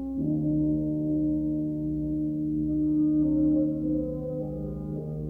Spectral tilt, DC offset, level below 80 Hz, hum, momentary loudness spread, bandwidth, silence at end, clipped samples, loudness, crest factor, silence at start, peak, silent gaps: -13 dB/octave; under 0.1%; -44 dBFS; none; 9 LU; 1.3 kHz; 0 s; under 0.1%; -27 LUFS; 12 dB; 0 s; -16 dBFS; none